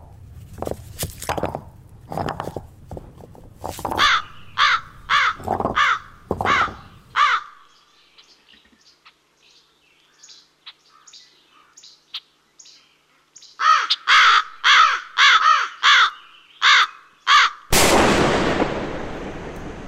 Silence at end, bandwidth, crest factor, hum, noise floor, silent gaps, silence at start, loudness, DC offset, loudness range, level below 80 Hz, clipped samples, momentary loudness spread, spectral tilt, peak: 0 s; 16 kHz; 18 dB; none; -59 dBFS; none; 0.3 s; -17 LUFS; under 0.1%; 13 LU; -42 dBFS; under 0.1%; 21 LU; -2 dB/octave; -4 dBFS